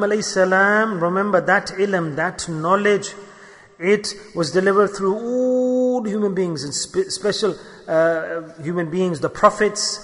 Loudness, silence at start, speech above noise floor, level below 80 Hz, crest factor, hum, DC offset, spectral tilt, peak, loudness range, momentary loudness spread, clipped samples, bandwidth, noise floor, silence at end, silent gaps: -19 LUFS; 0 s; 25 dB; -56 dBFS; 18 dB; none; under 0.1%; -4.5 dB/octave; 0 dBFS; 3 LU; 9 LU; under 0.1%; 11 kHz; -45 dBFS; 0 s; none